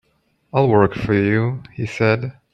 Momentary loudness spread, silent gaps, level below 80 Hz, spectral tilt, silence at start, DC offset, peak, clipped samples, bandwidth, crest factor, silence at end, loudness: 9 LU; none; -48 dBFS; -8 dB/octave; 0.55 s; under 0.1%; -2 dBFS; under 0.1%; 7.8 kHz; 16 dB; 0.25 s; -19 LUFS